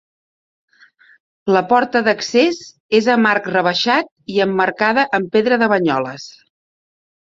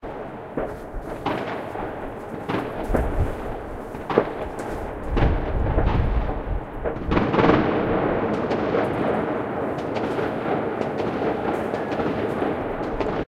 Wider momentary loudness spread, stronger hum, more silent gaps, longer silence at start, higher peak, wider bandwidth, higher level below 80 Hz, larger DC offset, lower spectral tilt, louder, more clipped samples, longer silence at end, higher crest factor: about the same, 8 LU vs 10 LU; neither; first, 2.80-2.89 s, 4.12-4.16 s vs none; first, 1.45 s vs 0 s; about the same, -2 dBFS vs 0 dBFS; second, 7.8 kHz vs 14 kHz; second, -62 dBFS vs -32 dBFS; neither; second, -4.5 dB/octave vs -8 dB/octave; first, -16 LUFS vs -25 LUFS; neither; first, 1.1 s vs 0.1 s; second, 16 dB vs 24 dB